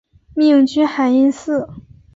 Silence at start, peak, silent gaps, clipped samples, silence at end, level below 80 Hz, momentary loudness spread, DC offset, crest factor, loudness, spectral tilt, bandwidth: 0.35 s; -4 dBFS; none; under 0.1%; 0.35 s; -52 dBFS; 12 LU; under 0.1%; 12 dB; -15 LUFS; -5.5 dB/octave; 7.8 kHz